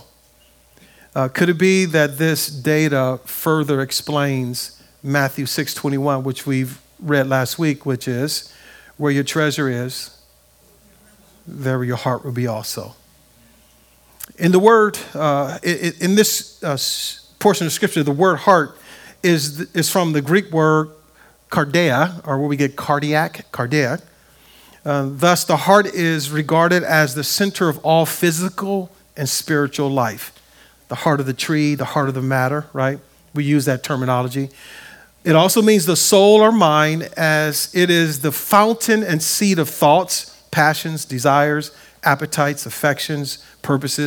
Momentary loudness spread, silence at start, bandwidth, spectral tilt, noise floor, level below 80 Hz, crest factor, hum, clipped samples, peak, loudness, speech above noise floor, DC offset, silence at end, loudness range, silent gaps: 11 LU; 1.15 s; over 20 kHz; -4.5 dB/octave; -53 dBFS; -60 dBFS; 18 dB; none; under 0.1%; 0 dBFS; -17 LUFS; 36 dB; under 0.1%; 0 s; 7 LU; none